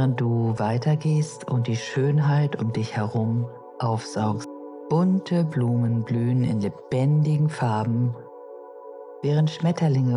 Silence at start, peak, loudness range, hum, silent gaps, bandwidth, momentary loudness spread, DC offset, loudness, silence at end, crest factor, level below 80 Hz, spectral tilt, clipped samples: 0 s; -10 dBFS; 2 LU; none; none; 11 kHz; 14 LU; under 0.1%; -24 LUFS; 0 s; 14 dB; -66 dBFS; -8 dB/octave; under 0.1%